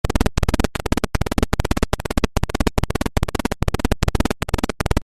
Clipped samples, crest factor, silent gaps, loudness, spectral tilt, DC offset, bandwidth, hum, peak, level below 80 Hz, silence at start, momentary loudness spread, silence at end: under 0.1%; 18 dB; none; -22 LUFS; -5.5 dB/octave; under 0.1%; 15 kHz; none; -2 dBFS; -24 dBFS; 0.05 s; 2 LU; 0 s